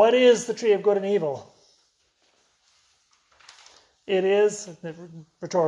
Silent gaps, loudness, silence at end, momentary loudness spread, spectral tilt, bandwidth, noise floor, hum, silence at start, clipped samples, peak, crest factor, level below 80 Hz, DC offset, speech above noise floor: none; -22 LUFS; 0 s; 22 LU; -4.5 dB/octave; 11 kHz; -67 dBFS; none; 0 s; under 0.1%; -6 dBFS; 18 dB; -76 dBFS; under 0.1%; 45 dB